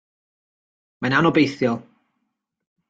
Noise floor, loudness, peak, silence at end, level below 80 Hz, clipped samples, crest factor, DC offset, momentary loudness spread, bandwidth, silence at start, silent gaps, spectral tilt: -77 dBFS; -20 LUFS; -4 dBFS; 1.05 s; -62 dBFS; under 0.1%; 20 dB; under 0.1%; 11 LU; 7.8 kHz; 1 s; none; -6.5 dB/octave